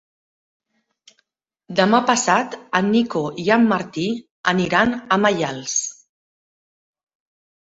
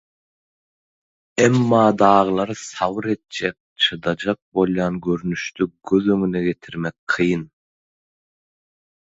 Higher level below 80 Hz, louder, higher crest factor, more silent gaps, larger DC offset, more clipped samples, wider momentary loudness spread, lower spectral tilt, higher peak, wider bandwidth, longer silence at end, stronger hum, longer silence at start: second, -60 dBFS vs -54 dBFS; about the same, -19 LUFS vs -20 LUFS; about the same, 20 dB vs 22 dB; second, 4.31-4.44 s vs 3.60-3.76 s, 4.42-4.52 s, 6.99-7.07 s; neither; neither; second, 8 LU vs 12 LU; second, -4 dB/octave vs -5.5 dB/octave; about the same, -2 dBFS vs 0 dBFS; about the same, 8 kHz vs 8 kHz; first, 1.8 s vs 1.55 s; neither; first, 1.7 s vs 1.35 s